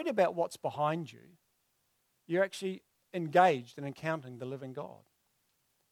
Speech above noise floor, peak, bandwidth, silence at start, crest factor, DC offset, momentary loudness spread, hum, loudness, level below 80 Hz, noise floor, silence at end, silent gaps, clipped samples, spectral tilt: 44 dB; -12 dBFS; 15.5 kHz; 0 s; 22 dB; under 0.1%; 17 LU; none; -33 LUFS; -82 dBFS; -77 dBFS; 1 s; none; under 0.1%; -6 dB/octave